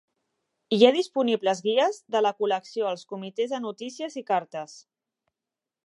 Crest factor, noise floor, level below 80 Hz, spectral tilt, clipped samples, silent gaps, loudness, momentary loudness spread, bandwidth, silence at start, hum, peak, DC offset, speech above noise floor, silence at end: 24 dB; -89 dBFS; -86 dBFS; -4.5 dB/octave; under 0.1%; none; -25 LUFS; 15 LU; 11.5 kHz; 0.7 s; none; -4 dBFS; under 0.1%; 64 dB; 1.05 s